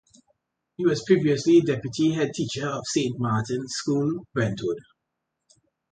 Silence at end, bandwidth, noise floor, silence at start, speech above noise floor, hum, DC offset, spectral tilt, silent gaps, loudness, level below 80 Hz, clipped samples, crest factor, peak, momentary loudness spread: 1.15 s; 9.4 kHz; -81 dBFS; 0.8 s; 58 dB; none; under 0.1%; -5.5 dB/octave; none; -24 LUFS; -60 dBFS; under 0.1%; 18 dB; -8 dBFS; 9 LU